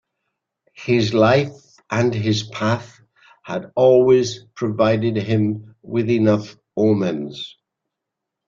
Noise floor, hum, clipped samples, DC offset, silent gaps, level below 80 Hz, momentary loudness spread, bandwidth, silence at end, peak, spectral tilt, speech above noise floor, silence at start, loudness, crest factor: -82 dBFS; none; under 0.1%; under 0.1%; none; -56 dBFS; 15 LU; 7.6 kHz; 1 s; -2 dBFS; -6.5 dB/octave; 64 dB; 0.8 s; -19 LUFS; 18 dB